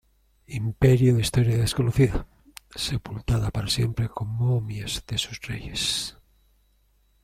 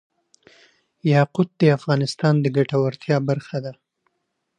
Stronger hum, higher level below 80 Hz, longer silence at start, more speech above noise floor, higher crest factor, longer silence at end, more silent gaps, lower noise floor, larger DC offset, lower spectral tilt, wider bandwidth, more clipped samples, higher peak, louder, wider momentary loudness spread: neither; first, -40 dBFS vs -66 dBFS; second, 0.5 s vs 1.05 s; second, 40 dB vs 56 dB; about the same, 20 dB vs 18 dB; first, 1.15 s vs 0.85 s; neither; second, -64 dBFS vs -75 dBFS; neither; second, -5.5 dB/octave vs -7.5 dB/octave; first, 15 kHz vs 9.8 kHz; neither; about the same, -6 dBFS vs -4 dBFS; second, -25 LUFS vs -21 LUFS; first, 12 LU vs 9 LU